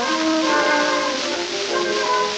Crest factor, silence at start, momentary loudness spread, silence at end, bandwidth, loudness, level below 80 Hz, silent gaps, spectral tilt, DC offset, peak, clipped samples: 14 dB; 0 s; 5 LU; 0 s; 9.4 kHz; -19 LUFS; -58 dBFS; none; -1.5 dB/octave; under 0.1%; -6 dBFS; under 0.1%